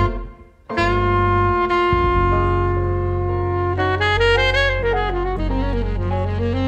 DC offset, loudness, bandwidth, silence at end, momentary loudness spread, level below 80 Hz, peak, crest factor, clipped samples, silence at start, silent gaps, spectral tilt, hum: under 0.1%; -19 LUFS; 8.2 kHz; 0 s; 7 LU; -26 dBFS; -2 dBFS; 16 dB; under 0.1%; 0 s; none; -7 dB/octave; none